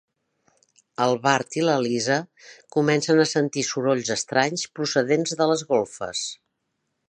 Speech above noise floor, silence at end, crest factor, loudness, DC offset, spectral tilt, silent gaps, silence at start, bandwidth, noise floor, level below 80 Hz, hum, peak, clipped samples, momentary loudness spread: 54 dB; 0.75 s; 22 dB; -23 LUFS; under 0.1%; -4 dB/octave; none; 1 s; 10 kHz; -77 dBFS; -68 dBFS; none; -2 dBFS; under 0.1%; 9 LU